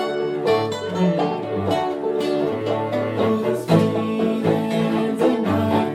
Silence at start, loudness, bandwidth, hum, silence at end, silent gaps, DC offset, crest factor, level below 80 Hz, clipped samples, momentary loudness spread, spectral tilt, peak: 0 s; -21 LUFS; 14.5 kHz; none; 0 s; none; under 0.1%; 16 dB; -62 dBFS; under 0.1%; 5 LU; -7 dB/octave; -4 dBFS